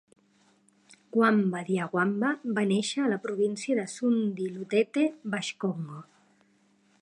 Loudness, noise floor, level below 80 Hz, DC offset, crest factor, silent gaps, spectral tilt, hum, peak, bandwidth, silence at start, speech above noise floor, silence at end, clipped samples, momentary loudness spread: -28 LUFS; -66 dBFS; -80 dBFS; under 0.1%; 20 dB; none; -5.5 dB/octave; none; -10 dBFS; 11 kHz; 1.15 s; 38 dB; 1 s; under 0.1%; 8 LU